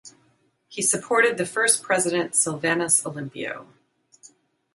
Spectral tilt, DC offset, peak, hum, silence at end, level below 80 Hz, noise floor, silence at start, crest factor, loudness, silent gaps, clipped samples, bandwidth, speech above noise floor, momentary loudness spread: -2 dB/octave; under 0.1%; -6 dBFS; none; 1.1 s; -72 dBFS; -65 dBFS; 0.05 s; 20 dB; -22 LUFS; none; under 0.1%; 12 kHz; 42 dB; 13 LU